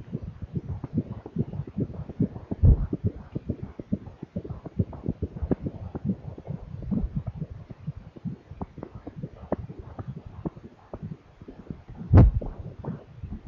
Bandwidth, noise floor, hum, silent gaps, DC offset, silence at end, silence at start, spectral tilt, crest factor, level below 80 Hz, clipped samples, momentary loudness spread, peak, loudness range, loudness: 4.3 kHz; -47 dBFS; none; none; under 0.1%; 0 s; 0 s; -11.5 dB/octave; 22 dB; -34 dBFS; under 0.1%; 19 LU; -6 dBFS; 12 LU; -30 LUFS